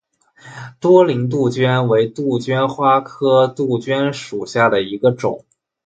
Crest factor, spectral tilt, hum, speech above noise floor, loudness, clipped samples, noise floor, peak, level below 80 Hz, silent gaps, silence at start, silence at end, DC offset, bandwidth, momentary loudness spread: 16 dB; -7 dB/octave; none; 29 dB; -16 LUFS; under 0.1%; -45 dBFS; 0 dBFS; -58 dBFS; none; 0.45 s; 0.5 s; under 0.1%; 9 kHz; 10 LU